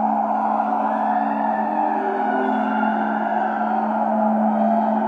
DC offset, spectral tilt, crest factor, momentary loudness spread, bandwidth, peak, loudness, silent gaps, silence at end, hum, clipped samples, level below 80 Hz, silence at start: under 0.1%; -8.5 dB/octave; 12 dB; 3 LU; 4.8 kHz; -8 dBFS; -21 LUFS; none; 0 s; none; under 0.1%; -80 dBFS; 0 s